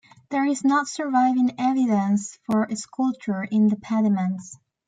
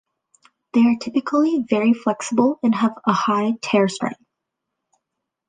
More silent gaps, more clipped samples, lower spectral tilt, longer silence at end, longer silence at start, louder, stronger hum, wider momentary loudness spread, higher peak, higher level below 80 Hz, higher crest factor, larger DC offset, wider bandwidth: neither; neither; about the same, -6 dB/octave vs -5.5 dB/octave; second, 0.3 s vs 1.35 s; second, 0.3 s vs 0.75 s; second, -23 LUFS vs -20 LUFS; neither; first, 8 LU vs 4 LU; second, -10 dBFS vs -2 dBFS; about the same, -70 dBFS vs -68 dBFS; about the same, 14 dB vs 18 dB; neither; about the same, 9.4 kHz vs 9.6 kHz